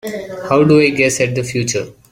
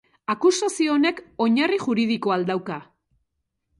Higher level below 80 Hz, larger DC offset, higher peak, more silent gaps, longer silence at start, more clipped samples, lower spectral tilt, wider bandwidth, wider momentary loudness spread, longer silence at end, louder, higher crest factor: first, -48 dBFS vs -68 dBFS; neither; first, 0 dBFS vs -6 dBFS; neither; second, 0.05 s vs 0.3 s; neither; about the same, -5 dB/octave vs -4.5 dB/octave; first, 16.5 kHz vs 11.5 kHz; first, 13 LU vs 9 LU; second, 0.2 s vs 0.95 s; first, -14 LUFS vs -22 LUFS; about the same, 14 dB vs 16 dB